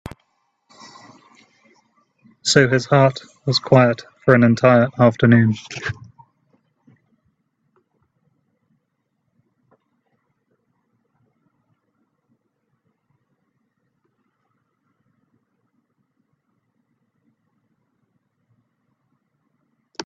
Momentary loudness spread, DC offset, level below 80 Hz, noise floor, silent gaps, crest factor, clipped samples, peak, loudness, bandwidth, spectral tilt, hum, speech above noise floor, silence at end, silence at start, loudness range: 15 LU; under 0.1%; -58 dBFS; -73 dBFS; none; 22 dB; under 0.1%; 0 dBFS; -16 LUFS; 9 kHz; -6 dB/octave; none; 57 dB; 0.05 s; 2.45 s; 7 LU